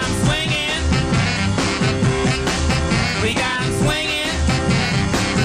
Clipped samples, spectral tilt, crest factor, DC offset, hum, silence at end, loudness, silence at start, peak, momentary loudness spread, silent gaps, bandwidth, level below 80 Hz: under 0.1%; -4.5 dB/octave; 12 dB; under 0.1%; none; 0 s; -18 LUFS; 0 s; -6 dBFS; 1 LU; none; 15 kHz; -28 dBFS